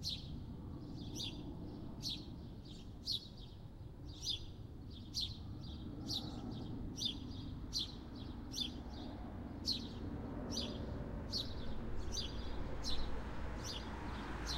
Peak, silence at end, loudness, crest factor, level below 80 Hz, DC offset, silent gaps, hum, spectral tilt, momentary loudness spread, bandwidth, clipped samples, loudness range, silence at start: -26 dBFS; 0 s; -44 LUFS; 18 dB; -50 dBFS; under 0.1%; none; none; -4 dB/octave; 10 LU; 16 kHz; under 0.1%; 3 LU; 0 s